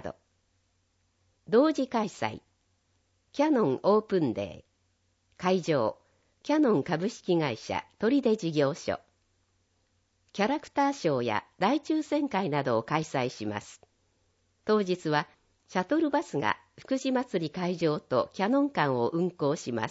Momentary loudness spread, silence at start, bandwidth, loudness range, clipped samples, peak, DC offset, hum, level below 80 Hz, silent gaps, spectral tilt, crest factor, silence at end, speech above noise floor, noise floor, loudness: 10 LU; 0.05 s; 8 kHz; 3 LU; under 0.1%; -10 dBFS; under 0.1%; none; -70 dBFS; none; -6 dB/octave; 20 dB; 0 s; 45 dB; -73 dBFS; -29 LUFS